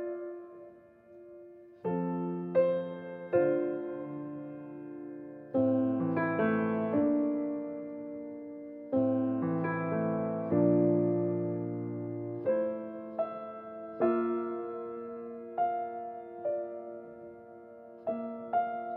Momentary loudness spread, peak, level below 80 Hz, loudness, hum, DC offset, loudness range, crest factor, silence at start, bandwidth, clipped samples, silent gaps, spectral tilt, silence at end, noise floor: 16 LU; -16 dBFS; -78 dBFS; -32 LUFS; none; under 0.1%; 6 LU; 18 dB; 0 s; 4 kHz; under 0.1%; none; -11.5 dB/octave; 0 s; -55 dBFS